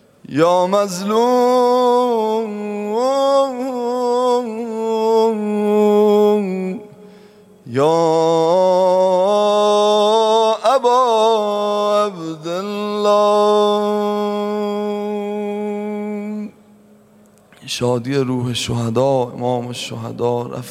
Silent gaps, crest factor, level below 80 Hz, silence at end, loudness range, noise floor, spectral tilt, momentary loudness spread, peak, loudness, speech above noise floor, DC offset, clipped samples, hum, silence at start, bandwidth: none; 16 dB; -60 dBFS; 0 s; 9 LU; -49 dBFS; -5.5 dB/octave; 11 LU; -2 dBFS; -17 LUFS; 32 dB; under 0.1%; under 0.1%; none; 0.3 s; 15.5 kHz